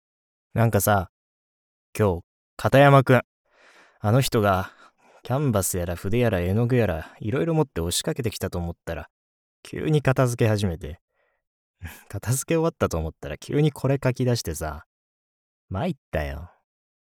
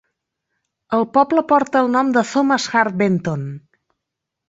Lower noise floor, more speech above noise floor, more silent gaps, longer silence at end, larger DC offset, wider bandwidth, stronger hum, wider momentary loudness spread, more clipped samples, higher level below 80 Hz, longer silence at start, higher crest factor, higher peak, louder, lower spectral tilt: second, -55 dBFS vs -81 dBFS; second, 33 dB vs 64 dB; first, 1.09-1.93 s, 2.24-2.57 s, 3.24-3.45 s, 9.10-9.63 s, 11.01-11.08 s, 11.47-11.74 s, 14.86-15.68 s, 15.98-16.12 s vs none; second, 0.7 s vs 0.9 s; neither; first, 19.5 kHz vs 8 kHz; neither; first, 15 LU vs 10 LU; neither; first, -44 dBFS vs -62 dBFS; second, 0.55 s vs 0.9 s; about the same, 22 dB vs 18 dB; about the same, -2 dBFS vs -2 dBFS; second, -23 LUFS vs -17 LUFS; about the same, -6 dB/octave vs -5.5 dB/octave